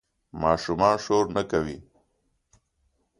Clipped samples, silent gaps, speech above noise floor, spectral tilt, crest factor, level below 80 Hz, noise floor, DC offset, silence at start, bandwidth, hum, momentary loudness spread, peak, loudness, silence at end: under 0.1%; none; 48 dB; -5.5 dB/octave; 22 dB; -50 dBFS; -72 dBFS; under 0.1%; 0.35 s; 11 kHz; none; 15 LU; -6 dBFS; -25 LUFS; 1.4 s